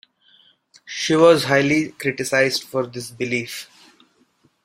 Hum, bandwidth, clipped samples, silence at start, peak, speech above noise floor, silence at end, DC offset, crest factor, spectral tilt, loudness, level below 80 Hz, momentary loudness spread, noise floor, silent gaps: none; 16 kHz; under 0.1%; 0.85 s; -2 dBFS; 42 dB; 1 s; under 0.1%; 20 dB; -4.5 dB/octave; -19 LUFS; -62 dBFS; 16 LU; -61 dBFS; none